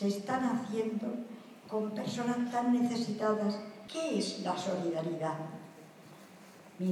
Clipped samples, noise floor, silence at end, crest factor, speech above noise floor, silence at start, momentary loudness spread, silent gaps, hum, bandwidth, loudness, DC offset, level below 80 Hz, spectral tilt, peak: under 0.1%; -54 dBFS; 0 s; 16 dB; 21 dB; 0 s; 23 LU; none; none; 13 kHz; -34 LUFS; under 0.1%; -84 dBFS; -5.5 dB/octave; -18 dBFS